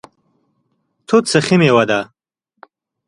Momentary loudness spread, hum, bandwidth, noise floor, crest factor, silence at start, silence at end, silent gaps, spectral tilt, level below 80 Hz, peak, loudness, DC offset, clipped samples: 8 LU; none; 11.5 kHz; -74 dBFS; 18 dB; 1.1 s; 1.05 s; none; -5 dB/octave; -58 dBFS; 0 dBFS; -14 LUFS; under 0.1%; under 0.1%